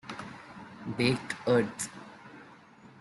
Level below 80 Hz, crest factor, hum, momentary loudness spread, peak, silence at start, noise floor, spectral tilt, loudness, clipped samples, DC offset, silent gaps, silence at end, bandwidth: -66 dBFS; 20 dB; none; 22 LU; -12 dBFS; 0.05 s; -54 dBFS; -5 dB/octave; -31 LUFS; under 0.1%; under 0.1%; none; 0 s; 12 kHz